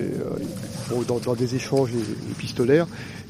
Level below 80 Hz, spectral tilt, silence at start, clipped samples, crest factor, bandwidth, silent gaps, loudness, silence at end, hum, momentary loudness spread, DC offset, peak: -54 dBFS; -6 dB/octave; 0 s; under 0.1%; 20 dB; 15.5 kHz; none; -25 LUFS; 0 s; none; 10 LU; under 0.1%; -6 dBFS